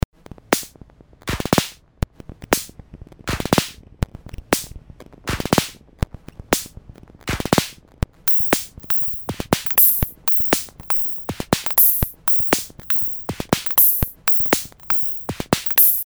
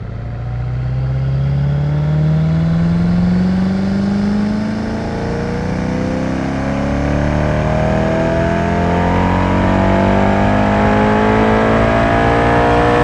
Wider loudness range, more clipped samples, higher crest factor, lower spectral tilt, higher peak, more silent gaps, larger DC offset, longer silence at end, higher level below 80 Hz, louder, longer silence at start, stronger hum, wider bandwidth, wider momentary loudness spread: first, 9 LU vs 5 LU; neither; first, 22 dB vs 14 dB; second, -3.5 dB/octave vs -8 dB/octave; about the same, 0 dBFS vs 0 dBFS; neither; first, 0.1% vs under 0.1%; about the same, 0 s vs 0 s; second, -36 dBFS vs -26 dBFS; second, -18 LUFS vs -15 LUFS; first, 0.5 s vs 0 s; neither; first, over 20 kHz vs 9.8 kHz; first, 17 LU vs 7 LU